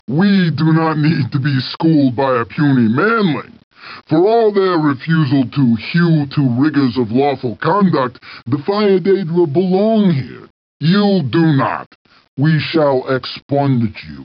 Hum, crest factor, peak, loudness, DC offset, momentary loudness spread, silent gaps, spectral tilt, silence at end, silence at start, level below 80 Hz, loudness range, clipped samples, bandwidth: none; 10 dB; -4 dBFS; -15 LUFS; under 0.1%; 7 LU; 3.64-3.71 s, 10.50-10.80 s, 11.86-12.05 s, 12.28-12.37 s, 13.42-13.49 s; -10 dB/octave; 0 s; 0.1 s; -56 dBFS; 2 LU; under 0.1%; 5.4 kHz